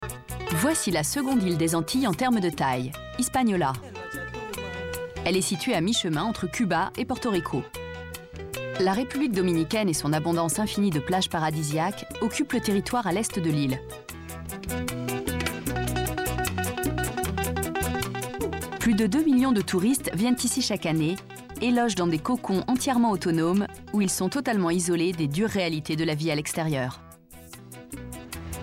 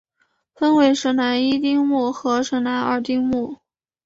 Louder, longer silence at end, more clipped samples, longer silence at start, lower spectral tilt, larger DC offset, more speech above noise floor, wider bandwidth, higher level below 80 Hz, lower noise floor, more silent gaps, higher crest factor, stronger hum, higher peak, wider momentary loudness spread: second, -26 LUFS vs -19 LUFS; second, 0 s vs 0.5 s; neither; second, 0 s vs 0.6 s; about the same, -4.5 dB/octave vs -4 dB/octave; neither; second, 22 dB vs 49 dB; first, 16.5 kHz vs 7.8 kHz; first, -46 dBFS vs -58 dBFS; second, -47 dBFS vs -68 dBFS; neither; about the same, 14 dB vs 16 dB; neither; second, -12 dBFS vs -4 dBFS; first, 12 LU vs 6 LU